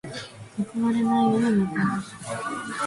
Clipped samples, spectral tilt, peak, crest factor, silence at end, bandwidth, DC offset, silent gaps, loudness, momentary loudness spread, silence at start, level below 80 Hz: under 0.1%; -6 dB/octave; -10 dBFS; 14 dB; 0 s; 11.5 kHz; under 0.1%; none; -25 LUFS; 15 LU; 0.05 s; -60 dBFS